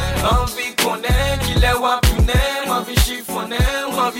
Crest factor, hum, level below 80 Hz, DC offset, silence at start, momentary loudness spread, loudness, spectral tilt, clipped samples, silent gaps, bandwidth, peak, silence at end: 14 dB; none; -22 dBFS; under 0.1%; 0 s; 4 LU; -18 LUFS; -4 dB/octave; under 0.1%; none; 17 kHz; -4 dBFS; 0 s